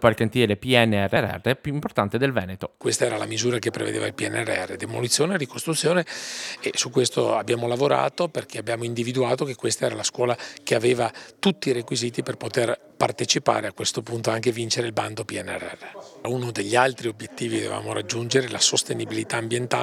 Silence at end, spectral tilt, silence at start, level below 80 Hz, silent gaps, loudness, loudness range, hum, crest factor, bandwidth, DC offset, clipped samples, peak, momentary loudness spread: 0 s; -4 dB/octave; 0 s; -62 dBFS; none; -24 LUFS; 3 LU; none; 24 dB; 16 kHz; under 0.1%; under 0.1%; 0 dBFS; 9 LU